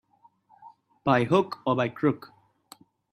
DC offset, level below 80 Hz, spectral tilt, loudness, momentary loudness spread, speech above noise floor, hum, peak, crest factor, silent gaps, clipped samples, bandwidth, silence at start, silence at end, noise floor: under 0.1%; -66 dBFS; -7.5 dB/octave; -26 LUFS; 8 LU; 38 dB; none; -8 dBFS; 22 dB; none; under 0.1%; 14.5 kHz; 0.65 s; 0.95 s; -62 dBFS